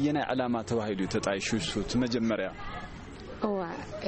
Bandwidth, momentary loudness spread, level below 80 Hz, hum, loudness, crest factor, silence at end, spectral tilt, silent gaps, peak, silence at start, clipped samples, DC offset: 8.8 kHz; 12 LU; -50 dBFS; none; -31 LUFS; 16 dB; 0 s; -5 dB/octave; none; -16 dBFS; 0 s; under 0.1%; under 0.1%